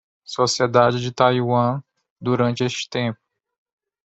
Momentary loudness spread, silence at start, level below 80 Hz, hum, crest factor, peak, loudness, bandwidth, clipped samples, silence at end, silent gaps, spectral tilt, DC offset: 13 LU; 0.3 s; -60 dBFS; none; 20 dB; -2 dBFS; -20 LUFS; 8.2 kHz; under 0.1%; 0.9 s; 2.10-2.16 s; -5 dB/octave; under 0.1%